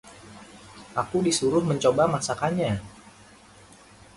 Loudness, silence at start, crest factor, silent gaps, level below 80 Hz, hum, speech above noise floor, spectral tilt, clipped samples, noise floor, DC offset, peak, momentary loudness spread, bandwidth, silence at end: -25 LUFS; 0.05 s; 20 dB; none; -54 dBFS; none; 27 dB; -5 dB/octave; under 0.1%; -51 dBFS; under 0.1%; -8 dBFS; 24 LU; 11.5 kHz; 1.15 s